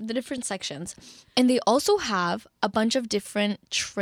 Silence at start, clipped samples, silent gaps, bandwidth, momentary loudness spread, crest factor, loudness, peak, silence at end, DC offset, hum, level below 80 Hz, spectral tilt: 0 s; under 0.1%; none; 15.5 kHz; 11 LU; 18 dB; -25 LUFS; -6 dBFS; 0 s; under 0.1%; none; -62 dBFS; -3.5 dB/octave